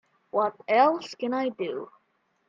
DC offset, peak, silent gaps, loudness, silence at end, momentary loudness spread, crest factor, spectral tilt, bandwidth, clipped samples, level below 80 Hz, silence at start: under 0.1%; -8 dBFS; none; -26 LUFS; 0.65 s; 13 LU; 20 dB; -5 dB/octave; 7.6 kHz; under 0.1%; -80 dBFS; 0.35 s